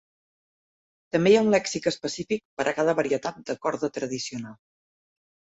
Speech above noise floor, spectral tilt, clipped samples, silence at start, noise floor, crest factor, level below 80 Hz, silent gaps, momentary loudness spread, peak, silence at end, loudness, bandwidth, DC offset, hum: over 65 dB; -4.5 dB/octave; under 0.1%; 1.15 s; under -90 dBFS; 18 dB; -64 dBFS; 2.45-2.57 s; 12 LU; -8 dBFS; 0.9 s; -25 LUFS; 8.2 kHz; under 0.1%; none